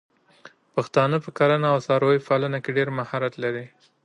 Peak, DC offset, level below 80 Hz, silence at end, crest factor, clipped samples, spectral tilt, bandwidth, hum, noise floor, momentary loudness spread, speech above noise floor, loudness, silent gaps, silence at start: -6 dBFS; under 0.1%; -70 dBFS; 0.35 s; 18 dB; under 0.1%; -7 dB/octave; 10 kHz; none; -51 dBFS; 9 LU; 29 dB; -23 LUFS; none; 0.45 s